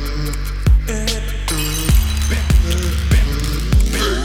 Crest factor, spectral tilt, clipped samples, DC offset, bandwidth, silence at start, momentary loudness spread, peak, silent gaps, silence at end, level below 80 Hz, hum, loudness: 14 dB; -4.5 dB/octave; under 0.1%; under 0.1%; 16.5 kHz; 0 s; 5 LU; -2 dBFS; none; 0 s; -16 dBFS; none; -18 LUFS